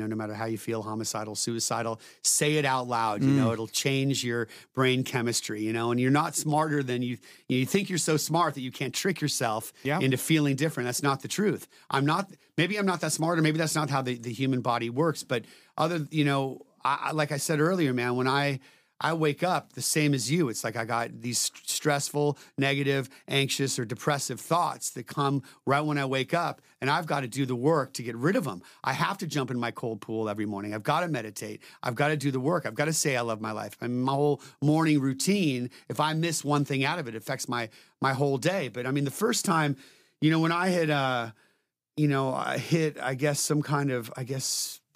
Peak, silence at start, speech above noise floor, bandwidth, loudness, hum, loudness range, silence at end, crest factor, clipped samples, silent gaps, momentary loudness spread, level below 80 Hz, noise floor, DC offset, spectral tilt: -10 dBFS; 0 s; 46 dB; 16 kHz; -28 LUFS; none; 2 LU; 0.2 s; 18 dB; under 0.1%; none; 8 LU; -76 dBFS; -74 dBFS; under 0.1%; -4.5 dB/octave